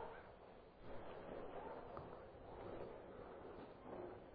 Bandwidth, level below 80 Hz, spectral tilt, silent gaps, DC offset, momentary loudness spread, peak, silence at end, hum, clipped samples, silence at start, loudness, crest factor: 4.9 kHz; -68 dBFS; -5.5 dB/octave; none; under 0.1%; 6 LU; -36 dBFS; 0 s; none; under 0.1%; 0 s; -55 LUFS; 18 dB